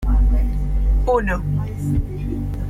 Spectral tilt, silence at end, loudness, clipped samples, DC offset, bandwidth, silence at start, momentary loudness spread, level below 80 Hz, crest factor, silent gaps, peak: -8.5 dB/octave; 0 s; -21 LUFS; under 0.1%; under 0.1%; 7.2 kHz; 0 s; 7 LU; -20 dBFS; 10 dB; none; -8 dBFS